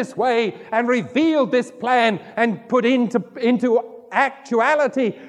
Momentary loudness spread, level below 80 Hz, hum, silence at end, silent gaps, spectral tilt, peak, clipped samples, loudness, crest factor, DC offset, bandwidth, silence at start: 4 LU; -72 dBFS; none; 0 s; none; -5.5 dB/octave; -4 dBFS; under 0.1%; -19 LUFS; 16 dB; under 0.1%; 10.5 kHz; 0 s